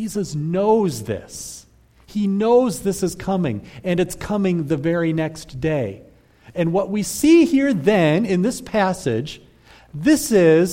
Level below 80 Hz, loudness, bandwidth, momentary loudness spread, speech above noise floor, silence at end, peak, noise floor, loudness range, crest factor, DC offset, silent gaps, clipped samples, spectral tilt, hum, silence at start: -48 dBFS; -19 LUFS; 16.5 kHz; 15 LU; 30 dB; 0 s; -4 dBFS; -49 dBFS; 4 LU; 16 dB; under 0.1%; none; under 0.1%; -6 dB/octave; none; 0 s